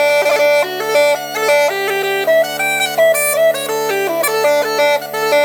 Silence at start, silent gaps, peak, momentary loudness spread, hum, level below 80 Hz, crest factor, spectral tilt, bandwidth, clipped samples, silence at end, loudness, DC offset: 0 s; none; -2 dBFS; 5 LU; none; -68 dBFS; 12 dB; -1.5 dB/octave; over 20 kHz; under 0.1%; 0 s; -14 LUFS; under 0.1%